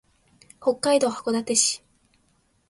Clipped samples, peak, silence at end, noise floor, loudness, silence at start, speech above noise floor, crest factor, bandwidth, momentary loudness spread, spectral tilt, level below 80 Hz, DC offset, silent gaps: under 0.1%; -6 dBFS; 0.9 s; -66 dBFS; -23 LUFS; 0.6 s; 43 dB; 20 dB; 11.5 kHz; 7 LU; -2 dB/octave; -68 dBFS; under 0.1%; none